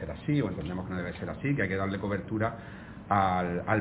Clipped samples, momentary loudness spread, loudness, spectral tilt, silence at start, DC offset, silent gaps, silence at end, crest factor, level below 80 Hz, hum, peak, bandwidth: under 0.1%; 9 LU; -31 LUFS; -6.5 dB/octave; 0 s; under 0.1%; none; 0 s; 20 dB; -50 dBFS; none; -12 dBFS; 4 kHz